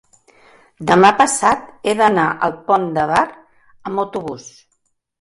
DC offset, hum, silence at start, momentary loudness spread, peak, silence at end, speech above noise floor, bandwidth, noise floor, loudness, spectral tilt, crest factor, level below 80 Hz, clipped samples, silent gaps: under 0.1%; none; 0.8 s; 15 LU; 0 dBFS; 0.7 s; 52 dB; 11.5 kHz; -68 dBFS; -16 LUFS; -4 dB/octave; 18 dB; -54 dBFS; under 0.1%; none